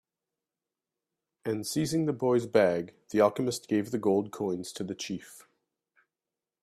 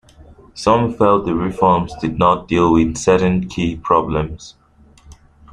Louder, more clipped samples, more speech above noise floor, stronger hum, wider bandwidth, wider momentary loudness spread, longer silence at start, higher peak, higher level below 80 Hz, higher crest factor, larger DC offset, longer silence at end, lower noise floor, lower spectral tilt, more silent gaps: second, -29 LUFS vs -16 LUFS; neither; first, over 61 dB vs 32 dB; neither; first, 15 kHz vs 10.5 kHz; first, 11 LU vs 7 LU; first, 1.45 s vs 0.55 s; second, -8 dBFS vs -2 dBFS; second, -70 dBFS vs -38 dBFS; first, 22 dB vs 16 dB; neither; first, 1.2 s vs 0.4 s; first, under -90 dBFS vs -48 dBFS; about the same, -5.5 dB/octave vs -6.5 dB/octave; neither